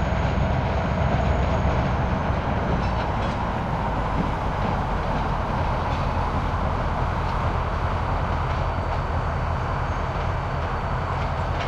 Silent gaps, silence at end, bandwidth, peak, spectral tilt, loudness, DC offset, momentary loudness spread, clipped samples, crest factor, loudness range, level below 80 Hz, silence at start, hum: none; 0 s; 8.4 kHz; -10 dBFS; -7.5 dB/octave; -25 LUFS; under 0.1%; 3 LU; under 0.1%; 14 dB; 2 LU; -28 dBFS; 0 s; none